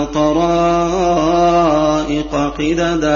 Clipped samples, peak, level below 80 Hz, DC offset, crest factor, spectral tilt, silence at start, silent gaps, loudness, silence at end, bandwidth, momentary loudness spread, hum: under 0.1%; -2 dBFS; -32 dBFS; under 0.1%; 12 dB; -5.5 dB/octave; 0 s; none; -14 LUFS; 0 s; 7.2 kHz; 5 LU; none